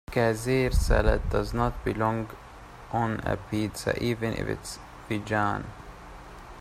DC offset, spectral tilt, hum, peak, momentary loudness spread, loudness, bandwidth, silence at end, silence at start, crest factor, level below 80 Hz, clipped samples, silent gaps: under 0.1%; -6 dB/octave; none; -6 dBFS; 21 LU; -28 LUFS; 15 kHz; 0 s; 0.1 s; 22 dB; -34 dBFS; under 0.1%; none